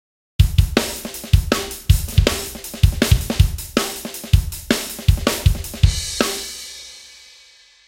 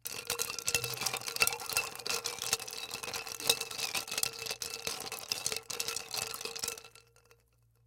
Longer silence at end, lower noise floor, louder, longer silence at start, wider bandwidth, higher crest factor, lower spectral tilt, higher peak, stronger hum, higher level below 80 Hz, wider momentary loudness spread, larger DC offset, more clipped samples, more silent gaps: about the same, 0.8 s vs 0.9 s; second, -49 dBFS vs -69 dBFS; first, -20 LUFS vs -34 LUFS; first, 0.4 s vs 0.05 s; about the same, 17 kHz vs 17 kHz; second, 18 dB vs 30 dB; first, -4.5 dB/octave vs 0 dB/octave; first, 0 dBFS vs -8 dBFS; neither; first, -22 dBFS vs -68 dBFS; first, 12 LU vs 8 LU; neither; neither; neither